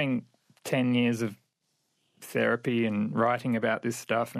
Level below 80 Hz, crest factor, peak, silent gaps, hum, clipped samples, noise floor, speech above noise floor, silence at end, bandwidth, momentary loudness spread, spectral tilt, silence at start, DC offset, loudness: -78 dBFS; 16 dB; -12 dBFS; none; none; under 0.1%; -77 dBFS; 49 dB; 0 s; 14.5 kHz; 8 LU; -6 dB/octave; 0 s; under 0.1%; -28 LUFS